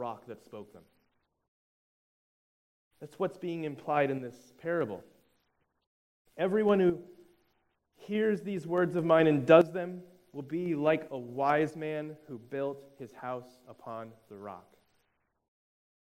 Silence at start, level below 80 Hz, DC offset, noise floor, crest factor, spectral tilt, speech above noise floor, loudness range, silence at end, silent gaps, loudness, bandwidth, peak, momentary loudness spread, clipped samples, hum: 0 s; -76 dBFS; under 0.1%; -77 dBFS; 26 dB; -7.5 dB/octave; 46 dB; 15 LU; 1.45 s; 1.48-2.91 s, 5.86-6.25 s; -30 LUFS; 15.5 kHz; -8 dBFS; 22 LU; under 0.1%; none